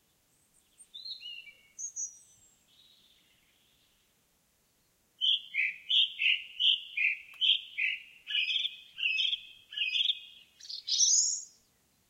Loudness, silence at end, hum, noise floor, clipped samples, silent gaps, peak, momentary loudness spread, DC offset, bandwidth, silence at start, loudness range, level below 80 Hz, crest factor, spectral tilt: -29 LUFS; 0.65 s; none; -72 dBFS; under 0.1%; none; -14 dBFS; 17 LU; under 0.1%; 16 kHz; 0.8 s; 16 LU; -82 dBFS; 20 dB; 6 dB/octave